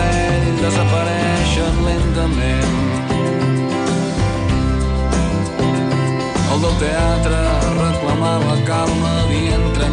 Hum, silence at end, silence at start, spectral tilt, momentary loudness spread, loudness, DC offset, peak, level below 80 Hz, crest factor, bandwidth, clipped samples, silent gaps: none; 0 s; 0 s; -6 dB/octave; 2 LU; -17 LUFS; under 0.1%; -6 dBFS; -24 dBFS; 10 dB; 10 kHz; under 0.1%; none